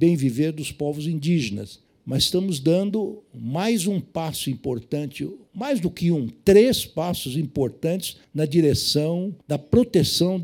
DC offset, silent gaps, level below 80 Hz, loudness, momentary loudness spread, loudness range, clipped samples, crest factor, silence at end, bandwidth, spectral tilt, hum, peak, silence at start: under 0.1%; none; -52 dBFS; -23 LUFS; 11 LU; 4 LU; under 0.1%; 18 dB; 0 s; 18 kHz; -5.5 dB/octave; none; -4 dBFS; 0 s